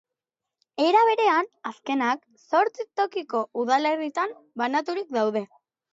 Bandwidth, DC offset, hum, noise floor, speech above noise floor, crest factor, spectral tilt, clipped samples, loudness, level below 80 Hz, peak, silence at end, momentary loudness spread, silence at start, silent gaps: 7.8 kHz; under 0.1%; none; -87 dBFS; 63 dB; 18 dB; -4 dB/octave; under 0.1%; -25 LUFS; -84 dBFS; -8 dBFS; 0.5 s; 12 LU; 0.8 s; none